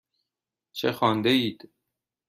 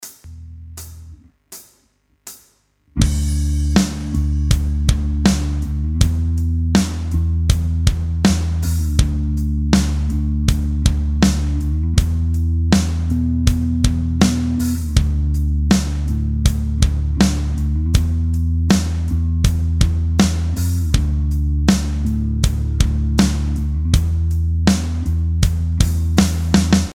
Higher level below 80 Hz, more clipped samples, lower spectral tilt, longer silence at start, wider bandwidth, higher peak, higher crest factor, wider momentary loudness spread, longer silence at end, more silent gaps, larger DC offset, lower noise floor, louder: second, -70 dBFS vs -20 dBFS; neither; about the same, -5.5 dB/octave vs -5.5 dB/octave; first, 0.75 s vs 0 s; about the same, 15 kHz vs 15.5 kHz; second, -8 dBFS vs 0 dBFS; about the same, 20 dB vs 16 dB; first, 10 LU vs 5 LU; first, 0.75 s vs 0 s; neither; neither; first, -88 dBFS vs -61 dBFS; second, -25 LUFS vs -18 LUFS